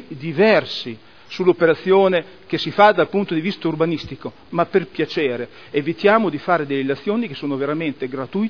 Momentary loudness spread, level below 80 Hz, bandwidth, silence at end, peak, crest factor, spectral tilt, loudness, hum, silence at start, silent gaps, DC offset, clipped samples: 12 LU; -60 dBFS; 5.4 kHz; 0 s; 0 dBFS; 20 dB; -7 dB/octave; -19 LUFS; none; 0 s; none; 0.4%; under 0.1%